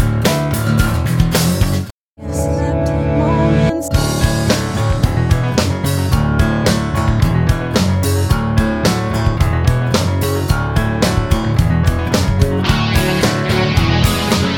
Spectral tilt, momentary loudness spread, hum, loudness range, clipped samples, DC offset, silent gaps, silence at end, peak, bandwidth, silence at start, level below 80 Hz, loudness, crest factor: -5.5 dB/octave; 3 LU; none; 1 LU; under 0.1%; under 0.1%; 1.91-2.16 s; 0 s; 0 dBFS; 19 kHz; 0 s; -22 dBFS; -15 LUFS; 14 dB